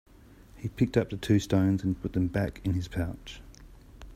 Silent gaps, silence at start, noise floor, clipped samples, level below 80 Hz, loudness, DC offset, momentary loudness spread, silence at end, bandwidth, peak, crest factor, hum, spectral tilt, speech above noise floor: none; 0.55 s; -53 dBFS; under 0.1%; -48 dBFS; -29 LUFS; under 0.1%; 15 LU; 0 s; 15.5 kHz; -10 dBFS; 20 dB; none; -7 dB/octave; 25 dB